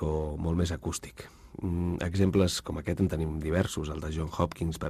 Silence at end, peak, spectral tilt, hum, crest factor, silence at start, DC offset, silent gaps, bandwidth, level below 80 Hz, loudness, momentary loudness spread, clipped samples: 0 s; -12 dBFS; -6 dB/octave; none; 18 dB; 0 s; under 0.1%; none; 14.5 kHz; -42 dBFS; -30 LUFS; 11 LU; under 0.1%